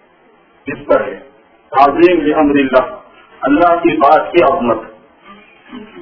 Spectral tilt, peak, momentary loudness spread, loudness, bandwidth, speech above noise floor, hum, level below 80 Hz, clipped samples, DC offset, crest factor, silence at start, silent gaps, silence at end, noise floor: -8 dB/octave; 0 dBFS; 17 LU; -12 LUFS; 5.4 kHz; 37 dB; none; -46 dBFS; 0.5%; under 0.1%; 14 dB; 0.65 s; none; 0 s; -49 dBFS